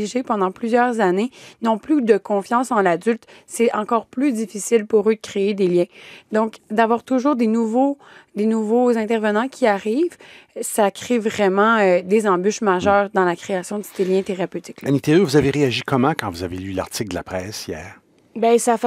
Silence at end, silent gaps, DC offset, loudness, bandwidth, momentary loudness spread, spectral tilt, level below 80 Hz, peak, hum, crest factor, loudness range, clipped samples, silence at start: 0 s; none; under 0.1%; -19 LUFS; 16 kHz; 11 LU; -5.5 dB/octave; -56 dBFS; -2 dBFS; none; 18 dB; 2 LU; under 0.1%; 0 s